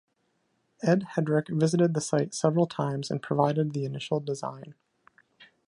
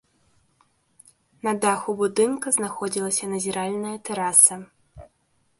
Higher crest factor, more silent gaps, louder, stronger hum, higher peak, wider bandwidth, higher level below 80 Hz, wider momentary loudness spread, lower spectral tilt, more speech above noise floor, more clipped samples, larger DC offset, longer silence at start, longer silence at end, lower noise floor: about the same, 22 dB vs 24 dB; neither; second, -27 LUFS vs -21 LUFS; neither; second, -6 dBFS vs -2 dBFS; about the same, 11 kHz vs 12 kHz; second, -72 dBFS vs -62 dBFS; second, 8 LU vs 15 LU; first, -6.5 dB/octave vs -2.5 dB/octave; about the same, 47 dB vs 44 dB; neither; neither; second, 0.8 s vs 1.45 s; second, 0.25 s vs 0.55 s; first, -74 dBFS vs -67 dBFS